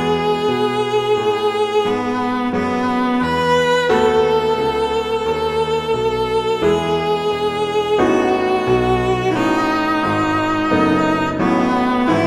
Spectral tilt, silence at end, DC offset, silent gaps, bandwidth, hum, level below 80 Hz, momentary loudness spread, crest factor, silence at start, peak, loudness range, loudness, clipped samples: -5.5 dB/octave; 0 s; under 0.1%; none; 13.5 kHz; none; -40 dBFS; 4 LU; 14 dB; 0 s; -2 dBFS; 1 LU; -17 LUFS; under 0.1%